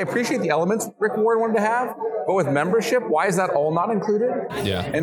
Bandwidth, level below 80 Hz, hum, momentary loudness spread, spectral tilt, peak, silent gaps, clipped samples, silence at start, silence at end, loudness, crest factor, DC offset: 19 kHz; -58 dBFS; none; 4 LU; -5.5 dB/octave; -6 dBFS; none; under 0.1%; 0 s; 0 s; -21 LUFS; 14 dB; under 0.1%